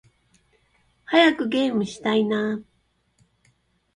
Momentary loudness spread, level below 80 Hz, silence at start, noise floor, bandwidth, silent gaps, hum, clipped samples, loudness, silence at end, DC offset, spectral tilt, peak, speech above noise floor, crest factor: 9 LU; -66 dBFS; 1.1 s; -68 dBFS; 10.5 kHz; none; none; under 0.1%; -22 LUFS; 1.35 s; under 0.1%; -5 dB/octave; -4 dBFS; 47 dB; 22 dB